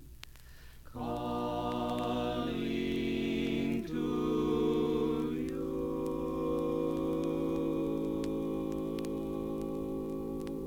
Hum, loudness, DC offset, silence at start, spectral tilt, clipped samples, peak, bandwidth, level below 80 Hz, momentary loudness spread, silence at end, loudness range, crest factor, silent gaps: none; -34 LUFS; under 0.1%; 0 s; -7 dB/octave; under 0.1%; -20 dBFS; 17.5 kHz; -52 dBFS; 6 LU; 0 s; 3 LU; 14 dB; none